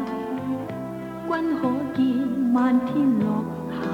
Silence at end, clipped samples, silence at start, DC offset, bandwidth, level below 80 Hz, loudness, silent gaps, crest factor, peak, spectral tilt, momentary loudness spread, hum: 0 s; under 0.1%; 0 s; under 0.1%; 8.2 kHz; -58 dBFS; -24 LUFS; none; 14 dB; -10 dBFS; -8 dB/octave; 10 LU; none